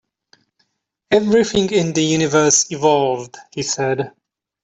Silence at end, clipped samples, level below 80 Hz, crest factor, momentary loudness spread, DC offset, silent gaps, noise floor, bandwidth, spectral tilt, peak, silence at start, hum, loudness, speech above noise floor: 0.55 s; under 0.1%; -54 dBFS; 16 dB; 12 LU; under 0.1%; none; -71 dBFS; 8.4 kHz; -3.5 dB/octave; -2 dBFS; 1.1 s; none; -17 LUFS; 54 dB